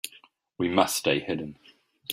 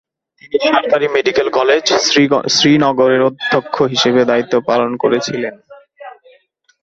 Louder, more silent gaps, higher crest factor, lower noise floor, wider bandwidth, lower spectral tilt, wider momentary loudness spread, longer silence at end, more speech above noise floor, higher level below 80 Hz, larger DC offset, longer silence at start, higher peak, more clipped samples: second, -26 LUFS vs -13 LUFS; neither; first, 24 dB vs 14 dB; about the same, -57 dBFS vs -54 dBFS; first, 16 kHz vs 8 kHz; about the same, -3.5 dB/octave vs -3.5 dB/octave; first, 17 LU vs 6 LU; second, 0 s vs 0.75 s; second, 31 dB vs 41 dB; second, -66 dBFS vs -56 dBFS; neither; second, 0.05 s vs 0.45 s; second, -4 dBFS vs 0 dBFS; neither